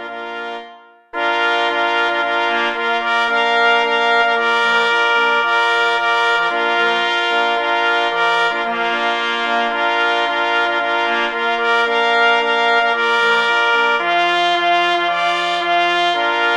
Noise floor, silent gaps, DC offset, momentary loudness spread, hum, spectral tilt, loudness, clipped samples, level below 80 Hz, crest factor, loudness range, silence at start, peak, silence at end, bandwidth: -41 dBFS; none; under 0.1%; 4 LU; none; -2 dB/octave; -15 LUFS; under 0.1%; -60 dBFS; 16 dB; 2 LU; 0 s; -2 dBFS; 0 s; 11 kHz